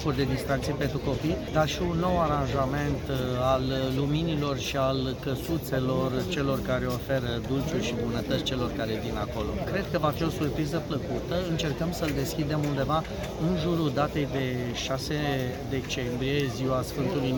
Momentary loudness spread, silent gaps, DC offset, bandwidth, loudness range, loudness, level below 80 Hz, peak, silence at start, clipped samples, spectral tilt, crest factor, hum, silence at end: 4 LU; none; under 0.1%; 19 kHz; 2 LU; -28 LUFS; -42 dBFS; -10 dBFS; 0 s; under 0.1%; -6 dB/octave; 16 dB; none; 0 s